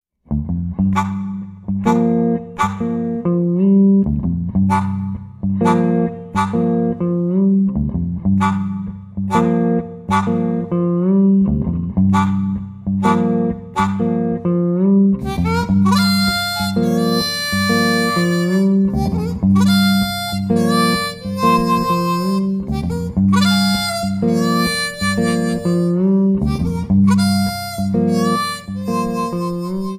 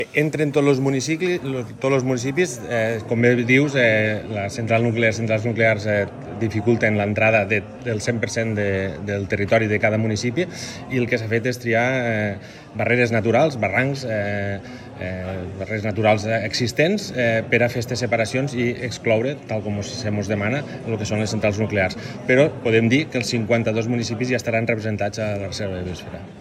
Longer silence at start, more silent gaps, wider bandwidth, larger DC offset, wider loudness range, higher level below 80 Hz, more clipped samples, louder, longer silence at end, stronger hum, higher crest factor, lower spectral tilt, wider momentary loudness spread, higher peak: first, 0.3 s vs 0 s; neither; first, 15.5 kHz vs 14 kHz; neither; about the same, 2 LU vs 4 LU; first, -36 dBFS vs -54 dBFS; neither; first, -17 LUFS vs -21 LUFS; about the same, 0 s vs 0 s; neither; about the same, 16 dB vs 18 dB; about the same, -6 dB/octave vs -5.5 dB/octave; about the same, 8 LU vs 10 LU; about the same, -2 dBFS vs -2 dBFS